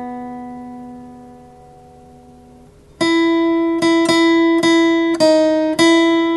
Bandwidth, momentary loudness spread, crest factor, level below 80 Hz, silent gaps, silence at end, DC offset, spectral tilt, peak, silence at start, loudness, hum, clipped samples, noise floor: 12 kHz; 19 LU; 14 dB; -52 dBFS; none; 0 s; under 0.1%; -4 dB/octave; -2 dBFS; 0 s; -14 LUFS; none; under 0.1%; -44 dBFS